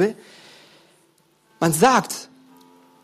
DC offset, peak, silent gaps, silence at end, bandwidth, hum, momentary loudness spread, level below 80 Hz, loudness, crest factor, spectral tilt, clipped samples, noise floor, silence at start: under 0.1%; -4 dBFS; none; 0.8 s; 15.5 kHz; none; 16 LU; -60 dBFS; -20 LUFS; 20 dB; -4 dB/octave; under 0.1%; -60 dBFS; 0 s